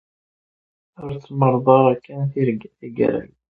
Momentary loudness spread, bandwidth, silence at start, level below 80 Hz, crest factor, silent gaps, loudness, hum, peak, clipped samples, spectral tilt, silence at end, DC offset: 18 LU; 4.6 kHz; 1 s; -58 dBFS; 20 dB; none; -19 LUFS; none; 0 dBFS; under 0.1%; -11 dB/octave; 0.25 s; under 0.1%